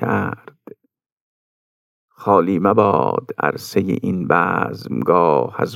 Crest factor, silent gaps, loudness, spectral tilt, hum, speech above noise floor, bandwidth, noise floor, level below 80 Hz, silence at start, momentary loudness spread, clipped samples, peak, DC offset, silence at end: 18 dB; 1.06-2.08 s; -18 LUFS; -7.5 dB/octave; none; 27 dB; 16 kHz; -44 dBFS; -66 dBFS; 0 s; 8 LU; under 0.1%; 0 dBFS; under 0.1%; 0 s